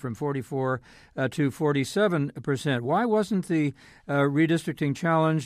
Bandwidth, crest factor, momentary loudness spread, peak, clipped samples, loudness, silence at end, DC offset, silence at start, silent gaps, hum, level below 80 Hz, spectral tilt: 15 kHz; 14 dB; 7 LU; -12 dBFS; under 0.1%; -26 LUFS; 0 s; under 0.1%; 0.05 s; none; none; -62 dBFS; -6.5 dB/octave